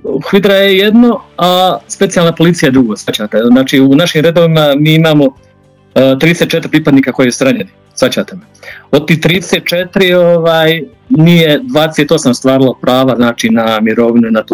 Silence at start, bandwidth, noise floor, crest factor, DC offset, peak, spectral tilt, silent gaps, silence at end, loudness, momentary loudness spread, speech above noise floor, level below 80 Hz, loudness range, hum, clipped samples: 0.05 s; over 20 kHz; -44 dBFS; 8 dB; under 0.1%; 0 dBFS; -5.5 dB/octave; none; 0 s; -9 LUFS; 6 LU; 36 dB; -46 dBFS; 3 LU; none; 1%